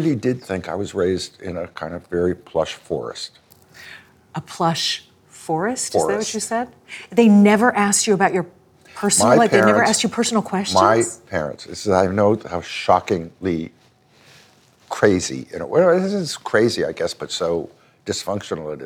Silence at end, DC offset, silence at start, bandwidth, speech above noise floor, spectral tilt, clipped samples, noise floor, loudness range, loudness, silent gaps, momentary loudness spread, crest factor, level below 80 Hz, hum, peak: 0 s; under 0.1%; 0 s; 18 kHz; 35 dB; -4 dB/octave; under 0.1%; -54 dBFS; 9 LU; -19 LUFS; none; 16 LU; 18 dB; -54 dBFS; none; 0 dBFS